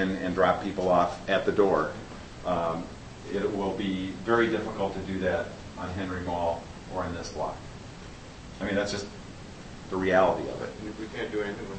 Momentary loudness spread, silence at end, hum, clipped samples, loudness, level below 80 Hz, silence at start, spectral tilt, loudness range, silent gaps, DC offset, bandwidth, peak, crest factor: 19 LU; 0 s; none; under 0.1%; -29 LUFS; -50 dBFS; 0 s; -6 dB/octave; 7 LU; none; under 0.1%; 8.8 kHz; -8 dBFS; 20 dB